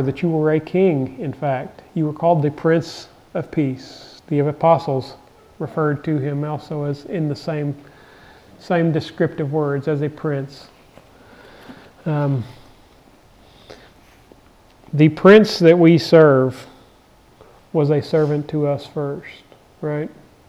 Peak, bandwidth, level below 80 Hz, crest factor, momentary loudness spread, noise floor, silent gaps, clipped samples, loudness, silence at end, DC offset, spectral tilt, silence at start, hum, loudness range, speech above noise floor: 0 dBFS; 12.5 kHz; -56 dBFS; 18 dB; 18 LU; -51 dBFS; none; under 0.1%; -18 LUFS; 0.4 s; under 0.1%; -8 dB/octave; 0 s; none; 14 LU; 33 dB